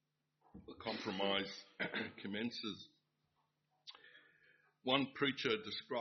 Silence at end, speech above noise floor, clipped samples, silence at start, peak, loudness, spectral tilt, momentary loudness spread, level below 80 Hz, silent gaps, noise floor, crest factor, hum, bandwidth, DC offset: 0 s; 42 dB; under 0.1%; 0.55 s; -18 dBFS; -40 LUFS; -2 dB/octave; 21 LU; -78 dBFS; none; -83 dBFS; 24 dB; none; 6.2 kHz; under 0.1%